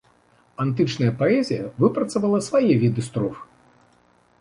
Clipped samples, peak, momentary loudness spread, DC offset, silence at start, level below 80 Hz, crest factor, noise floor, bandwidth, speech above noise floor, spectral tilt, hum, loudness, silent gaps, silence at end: under 0.1%; -4 dBFS; 9 LU; under 0.1%; 0.6 s; -58 dBFS; 18 dB; -59 dBFS; 11.5 kHz; 38 dB; -7 dB/octave; none; -22 LUFS; none; 0.95 s